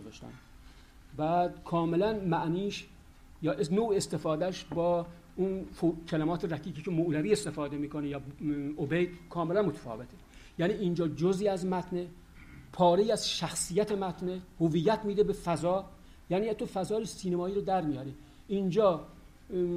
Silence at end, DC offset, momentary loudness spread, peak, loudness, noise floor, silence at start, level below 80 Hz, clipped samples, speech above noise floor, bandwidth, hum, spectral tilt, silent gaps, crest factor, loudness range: 0 s; under 0.1%; 10 LU; -14 dBFS; -31 LUFS; -53 dBFS; 0 s; -56 dBFS; under 0.1%; 23 dB; 15.5 kHz; none; -6 dB/octave; none; 18 dB; 3 LU